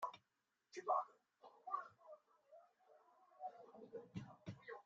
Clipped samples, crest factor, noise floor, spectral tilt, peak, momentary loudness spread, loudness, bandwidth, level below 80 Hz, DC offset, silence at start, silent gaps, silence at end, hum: under 0.1%; 24 dB; -88 dBFS; -5 dB/octave; -28 dBFS; 26 LU; -49 LUFS; 7.4 kHz; -88 dBFS; under 0.1%; 0 s; none; 0.05 s; none